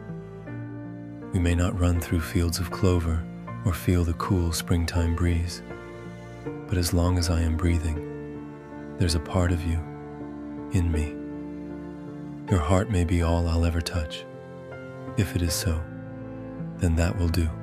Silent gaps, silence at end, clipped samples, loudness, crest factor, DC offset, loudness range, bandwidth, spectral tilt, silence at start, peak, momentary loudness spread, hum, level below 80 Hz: none; 0 s; under 0.1%; -27 LUFS; 20 dB; under 0.1%; 4 LU; 15 kHz; -6 dB/octave; 0 s; -6 dBFS; 15 LU; none; -36 dBFS